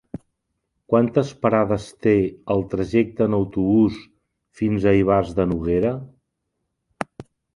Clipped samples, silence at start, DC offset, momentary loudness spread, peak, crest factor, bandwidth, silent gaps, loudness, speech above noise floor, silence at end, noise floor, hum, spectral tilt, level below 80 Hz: under 0.1%; 0.9 s; under 0.1%; 15 LU; -2 dBFS; 20 dB; 11 kHz; none; -20 LUFS; 57 dB; 0.35 s; -77 dBFS; none; -8.5 dB/octave; -44 dBFS